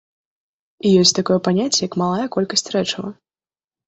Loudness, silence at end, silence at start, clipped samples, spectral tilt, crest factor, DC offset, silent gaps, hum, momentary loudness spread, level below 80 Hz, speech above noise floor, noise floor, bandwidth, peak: -18 LUFS; 0.75 s; 0.85 s; under 0.1%; -4 dB/octave; 20 dB; under 0.1%; none; none; 10 LU; -60 dBFS; over 72 dB; under -90 dBFS; 8.2 kHz; 0 dBFS